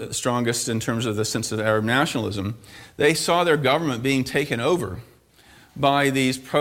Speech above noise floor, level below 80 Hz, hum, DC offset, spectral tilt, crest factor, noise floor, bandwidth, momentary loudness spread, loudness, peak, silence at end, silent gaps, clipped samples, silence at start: 30 dB; -54 dBFS; none; under 0.1%; -4.5 dB/octave; 18 dB; -52 dBFS; 17 kHz; 9 LU; -22 LUFS; -6 dBFS; 0 s; none; under 0.1%; 0 s